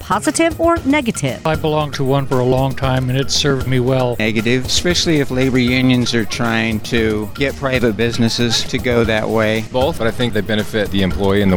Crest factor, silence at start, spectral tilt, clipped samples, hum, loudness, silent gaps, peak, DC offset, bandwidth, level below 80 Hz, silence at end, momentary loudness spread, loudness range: 14 dB; 0 s; -5 dB/octave; under 0.1%; none; -16 LUFS; none; -2 dBFS; under 0.1%; 19 kHz; -34 dBFS; 0 s; 4 LU; 1 LU